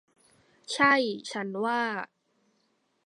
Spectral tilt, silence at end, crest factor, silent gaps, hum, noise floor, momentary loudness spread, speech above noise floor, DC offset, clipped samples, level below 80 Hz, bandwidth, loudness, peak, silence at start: -3.5 dB/octave; 1 s; 24 dB; none; none; -73 dBFS; 14 LU; 46 dB; under 0.1%; under 0.1%; -74 dBFS; 11.5 kHz; -27 LUFS; -8 dBFS; 0.7 s